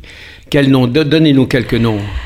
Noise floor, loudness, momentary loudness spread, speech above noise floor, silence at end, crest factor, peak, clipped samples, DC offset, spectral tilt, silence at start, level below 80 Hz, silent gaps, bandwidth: -35 dBFS; -12 LUFS; 5 LU; 24 dB; 0 s; 12 dB; 0 dBFS; under 0.1%; under 0.1%; -7 dB/octave; 0.05 s; -32 dBFS; none; 14.5 kHz